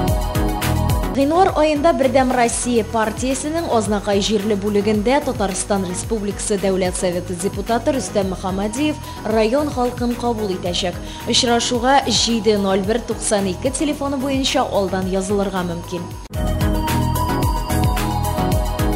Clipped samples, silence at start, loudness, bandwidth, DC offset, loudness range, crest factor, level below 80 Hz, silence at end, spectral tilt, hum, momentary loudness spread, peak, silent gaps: under 0.1%; 0 s; -19 LUFS; 16 kHz; under 0.1%; 4 LU; 16 dB; -30 dBFS; 0 s; -4.5 dB/octave; none; 7 LU; -2 dBFS; none